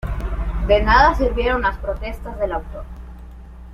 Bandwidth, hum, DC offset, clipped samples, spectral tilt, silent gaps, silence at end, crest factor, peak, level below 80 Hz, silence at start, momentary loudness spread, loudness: 6.6 kHz; none; under 0.1%; under 0.1%; -6.5 dB/octave; none; 0 s; 18 dB; -2 dBFS; -26 dBFS; 0.05 s; 23 LU; -19 LUFS